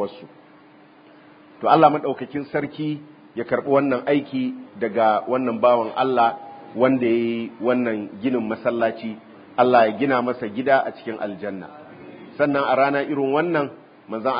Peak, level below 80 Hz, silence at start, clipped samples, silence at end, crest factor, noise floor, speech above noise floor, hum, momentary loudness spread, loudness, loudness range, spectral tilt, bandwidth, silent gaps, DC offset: -2 dBFS; -68 dBFS; 0 s; under 0.1%; 0 s; 20 dB; -50 dBFS; 29 dB; none; 16 LU; -21 LUFS; 3 LU; -11 dB/octave; 5.2 kHz; none; under 0.1%